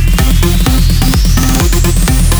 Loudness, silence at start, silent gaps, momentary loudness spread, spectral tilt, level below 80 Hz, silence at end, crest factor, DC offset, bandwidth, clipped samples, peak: -11 LUFS; 0 s; none; 0 LU; -4.5 dB/octave; -10 dBFS; 0 s; 8 dB; under 0.1%; over 20 kHz; under 0.1%; 0 dBFS